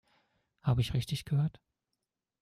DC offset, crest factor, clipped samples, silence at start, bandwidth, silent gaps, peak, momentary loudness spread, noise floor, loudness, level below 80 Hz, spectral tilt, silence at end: under 0.1%; 16 dB; under 0.1%; 0.65 s; 15 kHz; none; -20 dBFS; 6 LU; -87 dBFS; -33 LUFS; -54 dBFS; -6.5 dB/octave; 0.9 s